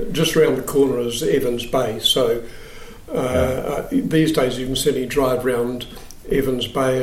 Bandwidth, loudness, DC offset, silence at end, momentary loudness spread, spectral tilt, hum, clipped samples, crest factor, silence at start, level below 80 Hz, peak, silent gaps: 16.5 kHz; -20 LUFS; under 0.1%; 0 s; 12 LU; -4.5 dB/octave; none; under 0.1%; 14 dB; 0 s; -38 dBFS; -4 dBFS; none